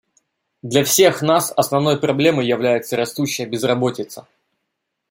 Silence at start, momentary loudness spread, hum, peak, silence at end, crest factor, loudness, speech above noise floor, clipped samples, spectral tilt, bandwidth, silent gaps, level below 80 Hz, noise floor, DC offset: 0.65 s; 10 LU; none; -2 dBFS; 0.9 s; 18 dB; -17 LUFS; 59 dB; under 0.1%; -4 dB/octave; 16.5 kHz; none; -62 dBFS; -76 dBFS; under 0.1%